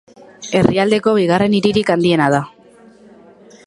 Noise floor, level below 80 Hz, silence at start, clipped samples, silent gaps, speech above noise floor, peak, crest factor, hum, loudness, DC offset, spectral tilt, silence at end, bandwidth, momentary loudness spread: -45 dBFS; -50 dBFS; 0.4 s; under 0.1%; none; 31 dB; 0 dBFS; 16 dB; none; -15 LUFS; under 0.1%; -6 dB/octave; 1.2 s; 11.5 kHz; 6 LU